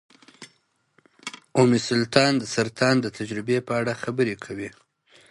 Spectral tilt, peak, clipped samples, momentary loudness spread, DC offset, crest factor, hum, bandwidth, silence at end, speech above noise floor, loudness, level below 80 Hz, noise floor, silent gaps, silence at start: -5 dB/octave; -2 dBFS; under 0.1%; 16 LU; under 0.1%; 22 dB; none; 11.5 kHz; 0.6 s; 44 dB; -23 LUFS; -62 dBFS; -66 dBFS; none; 0.4 s